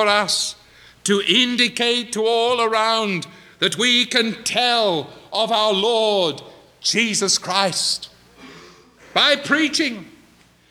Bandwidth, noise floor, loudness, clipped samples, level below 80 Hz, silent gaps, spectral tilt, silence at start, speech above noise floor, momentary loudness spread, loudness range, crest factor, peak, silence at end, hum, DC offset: 17.5 kHz; -53 dBFS; -18 LUFS; under 0.1%; -64 dBFS; none; -2 dB/octave; 0 s; 34 dB; 10 LU; 2 LU; 18 dB; -2 dBFS; 0.6 s; none; under 0.1%